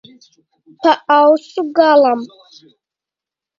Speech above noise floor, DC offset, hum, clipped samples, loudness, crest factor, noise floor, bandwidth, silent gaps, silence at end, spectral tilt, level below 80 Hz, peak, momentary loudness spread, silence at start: 75 dB; under 0.1%; none; under 0.1%; -13 LUFS; 16 dB; -87 dBFS; 7.4 kHz; none; 1.35 s; -4.5 dB/octave; -70 dBFS; 0 dBFS; 9 LU; 0.8 s